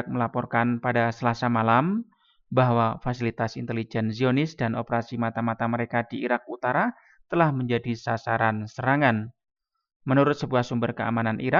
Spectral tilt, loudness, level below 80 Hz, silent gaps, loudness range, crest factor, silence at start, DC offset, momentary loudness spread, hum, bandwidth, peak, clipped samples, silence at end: -7.5 dB/octave; -25 LUFS; -58 dBFS; 9.96-10.00 s; 2 LU; 20 dB; 0 s; under 0.1%; 7 LU; none; 7.2 kHz; -6 dBFS; under 0.1%; 0 s